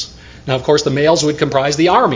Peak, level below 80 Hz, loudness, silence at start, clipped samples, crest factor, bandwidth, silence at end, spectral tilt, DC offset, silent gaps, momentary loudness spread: 0 dBFS; -42 dBFS; -14 LUFS; 0 s; under 0.1%; 14 dB; 7.6 kHz; 0 s; -4.5 dB/octave; under 0.1%; none; 11 LU